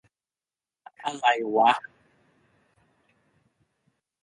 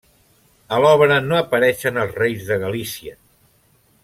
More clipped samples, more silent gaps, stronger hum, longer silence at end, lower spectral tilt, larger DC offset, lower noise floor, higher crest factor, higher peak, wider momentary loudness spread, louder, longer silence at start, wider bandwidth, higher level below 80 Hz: neither; neither; neither; first, 2.45 s vs 0.9 s; second, -3 dB/octave vs -5 dB/octave; neither; first, under -90 dBFS vs -58 dBFS; about the same, 22 dB vs 18 dB; second, -8 dBFS vs -2 dBFS; about the same, 14 LU vs 14 LU; second, -24 LUFS vs -18 LUFS; first, 1 s vs 0.7 s; second, 10.5 kHz vs 16.5 kHz; second, -80 dBFS vs -56 dBFS